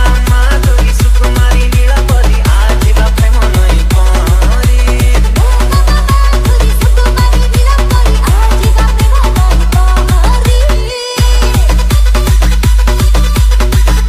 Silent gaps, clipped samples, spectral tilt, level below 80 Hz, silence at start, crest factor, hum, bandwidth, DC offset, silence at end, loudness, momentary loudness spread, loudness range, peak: none; under 0.1%; -5 dB/octave; -8 dBFS; 0 s; 6 dB; none; 15 kHz; under 0.1%; 0 s; -10 LUFS; 1 LU; 1 LU; 0 dBFS